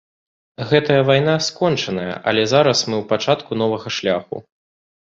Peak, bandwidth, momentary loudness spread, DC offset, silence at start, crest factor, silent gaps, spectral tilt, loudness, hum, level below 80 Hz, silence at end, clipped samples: -2 dBFS; 7.8 kHz; 9 LU; under 0.1%; 0.6 s; 18 dB; none; -4.5 dB/octave; -18 LUFS; none; -56 dBFS; 0.65 s; under 0.1%